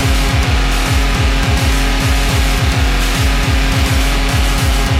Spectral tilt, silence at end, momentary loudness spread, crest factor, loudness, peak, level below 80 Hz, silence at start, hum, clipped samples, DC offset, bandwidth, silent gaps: -4.5 dB/octave; 0 s; 1 LU; 10 dB; -14 LUFS; -2 dBFS; -14 dBFS; 0 s; none; under 0.1%; under 0.1%; 16 kHz; none